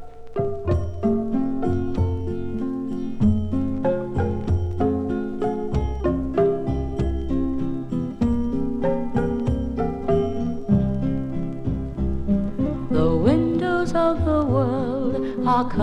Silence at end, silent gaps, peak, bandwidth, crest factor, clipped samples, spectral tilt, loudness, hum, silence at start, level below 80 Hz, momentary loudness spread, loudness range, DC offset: 0 s; none; -4 dBFS; 9.4 kHz; 18 dB; under 0.1%; -9 dB/octave; -24 LUFS; none; 0 s; -34 dBFS; 7 LU; 3 LU; under 0.1%